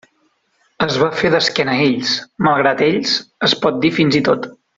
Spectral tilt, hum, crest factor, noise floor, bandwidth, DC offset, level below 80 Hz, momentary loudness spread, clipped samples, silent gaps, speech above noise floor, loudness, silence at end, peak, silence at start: -4.5 dB/octave; none; 16 dB; -62 dBFS; 7.8 kHz; under 0.1%; -54 dBFS; 5 LU; under 0.1%; none; 46 dB; -16 LUFS; 0.25 s; -2 dBFS; 0.8 s